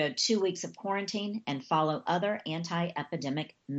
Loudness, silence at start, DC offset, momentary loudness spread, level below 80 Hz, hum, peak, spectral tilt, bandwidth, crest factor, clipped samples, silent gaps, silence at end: -32 LUFS; 0 s; under 0.1%; 8 LU; -78 dBFS; none; -16 dBFS; -4.5 dB/octave; 8.2 kHz; 16 dB; under 0.1%; none; 0 s